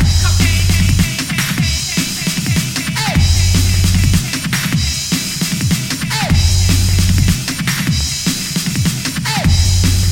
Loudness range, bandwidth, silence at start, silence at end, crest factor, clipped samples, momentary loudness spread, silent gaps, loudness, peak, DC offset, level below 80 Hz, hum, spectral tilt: 0 LU; 17 kHz; 0 s; 0 s; 12 dB; under 0.1%; 4 LU; none; -14 LUFS; 0 dBFS; under 0.1%; -22 dBFS; none; -3.5 dB/octave